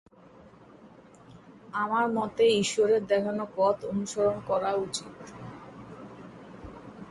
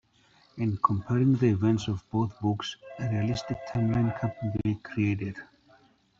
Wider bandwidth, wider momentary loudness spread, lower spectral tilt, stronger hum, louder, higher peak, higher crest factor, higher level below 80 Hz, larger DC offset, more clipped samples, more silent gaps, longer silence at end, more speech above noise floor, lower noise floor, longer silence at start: first, 11.5 kHz vs 7.4 kHz; first, 22 LU vs 10 LU; second, -4.5 dB/octave vs -7.5 dB/octave; neither; about the same, -27 LUFS vs -29 LUFS; second, -12 dBFS vs -8 dBFS; about the same, 18 dB vs 20 dB; second, -62 dBFS vs -56 dBFS; neither; neither; neither; second, 0 s vs 0.75 s; second, 27 dB vs 35 dB; second, -53 dBFS vs -62 dBFS; first, 0.85 s vs 0.55 s